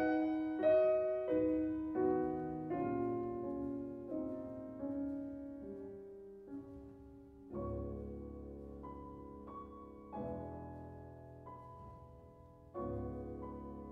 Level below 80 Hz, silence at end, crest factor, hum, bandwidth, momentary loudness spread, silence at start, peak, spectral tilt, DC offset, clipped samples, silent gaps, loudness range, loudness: -58 dBFS; 0 s; 18 dB; none; 5.6 kHz; 19 LU; 0 s; -22 dBFS; -10 dB/octave; under 0.1%; under 0.1%; none; 14 LU; -40 LUFS